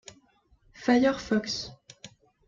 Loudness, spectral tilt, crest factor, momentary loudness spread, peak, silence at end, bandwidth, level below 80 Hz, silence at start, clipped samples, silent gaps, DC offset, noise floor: -27 LUFS; -4.5 dB/octave; 20 dB; 25 LU; -10 dBFS; 0.4 s; 7.6 kHz; -60 dBFS; 0.8 s; under 0.1%; none; under 0.1%; -64 dBFS